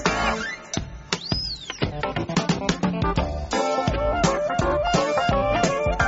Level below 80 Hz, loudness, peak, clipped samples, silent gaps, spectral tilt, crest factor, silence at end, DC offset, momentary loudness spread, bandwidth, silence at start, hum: -34 dBFS; -24 LUFS; -4 dBFS; under 0.1%; none; -4 dB/octave; 20 dB; 0 s; under 0.1%; 7 LU; 8 kHz; 0 s; none